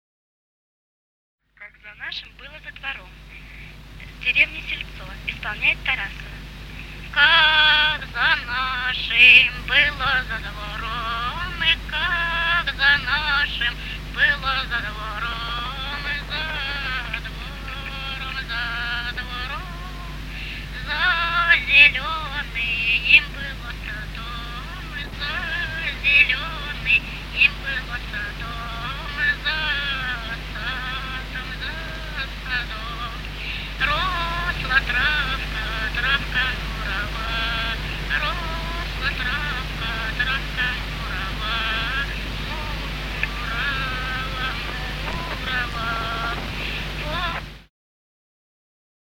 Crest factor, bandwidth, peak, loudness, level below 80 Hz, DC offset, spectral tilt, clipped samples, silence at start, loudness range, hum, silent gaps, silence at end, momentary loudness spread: 24 dB; 16.5 kHz; 0 dBFS; -21 LUFS; -34 dBFS; under 0.1%; -3.5 dB/octave; under 0.1%; 1.6 s; 11 LU; none; none; 1.35 s; 16 LU